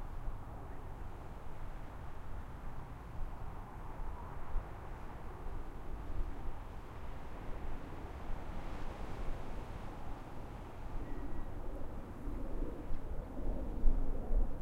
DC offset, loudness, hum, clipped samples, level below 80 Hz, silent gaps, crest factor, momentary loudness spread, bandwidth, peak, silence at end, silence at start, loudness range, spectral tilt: under 0.1%; -47 LUFS; none; under 0.1%; -40 dBFS; none; 22 dB; 8 LU; 4.8 kHz; -14 dBFS; 0 s; 0 s; 5 LU; -7.5 dB/octave